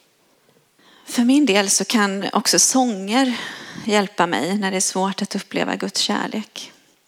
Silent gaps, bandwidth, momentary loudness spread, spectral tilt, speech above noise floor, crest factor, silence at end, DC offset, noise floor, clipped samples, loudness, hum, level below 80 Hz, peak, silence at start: none; 17.5 kHz; 13 LU; -2.5 dB/octave; 39 dB; 18 dB; 0.4 s; under 0.1%; -59 dBFS; under 0.1%; -19 LUFS; none; -74 dBFS; -2 dBFS; 1.05 s